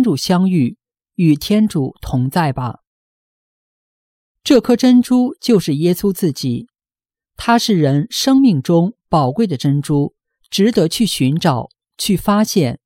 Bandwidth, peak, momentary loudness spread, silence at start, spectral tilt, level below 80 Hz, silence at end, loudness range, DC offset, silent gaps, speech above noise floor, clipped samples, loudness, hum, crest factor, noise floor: 16.5 kHz; -2 dBFS; 11 LU; 0 s; -6 dB/octave; -46 dBFS; 0.1 s; 4 LU; under 0.1%; 2.87-4.35 s; over 76 dB; under 0.1%; -15 LUFS; none; 14 dB; under -90 dBFS